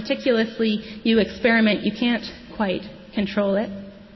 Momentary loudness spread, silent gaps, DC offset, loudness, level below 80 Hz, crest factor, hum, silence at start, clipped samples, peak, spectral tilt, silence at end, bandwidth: 12 LU; none; under 0.1%; -22 LUFS; -52 dBFS; 16 dB; none; 0 s; under 0.1%; -6 dBFS; -6.5 dB/octave; 0 s; 6 kHz